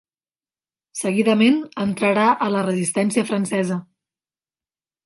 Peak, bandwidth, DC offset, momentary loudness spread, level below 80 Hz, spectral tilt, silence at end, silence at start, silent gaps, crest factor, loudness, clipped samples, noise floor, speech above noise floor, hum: -4 dBFS; 11.5 kHz; under 0.1%; 9 LU; -66 dBFS; -5 dB/octave; 1.2 s; 0.95 s; none; 18 dB; -20 LUFS; under 0.1%; under -90 dBFS; over 71 dB; none